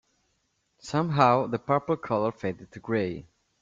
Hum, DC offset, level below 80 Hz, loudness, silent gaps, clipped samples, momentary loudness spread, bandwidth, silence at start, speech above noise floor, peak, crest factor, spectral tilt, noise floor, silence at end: none; under 0.1%; -62 dBFS; -27 LUFS; none; under 0.1%; 15 LU; 7.6 kHz; 0.85 s; 48 dB; -4 dBFS; 24 dB; -7 dB/octave; -74 dBFS; 0.4 s